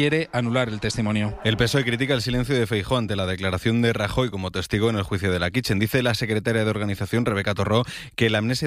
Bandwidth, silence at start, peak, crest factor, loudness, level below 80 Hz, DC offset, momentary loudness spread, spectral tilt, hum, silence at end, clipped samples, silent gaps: 15.5 kHz; 0 s; -6 dBFS; 18 dB; -23 LUFS; -44 dBFS; under 0.1%; 4 LU; -5.5 dB/octave; none; 0 s; under 0.1%; none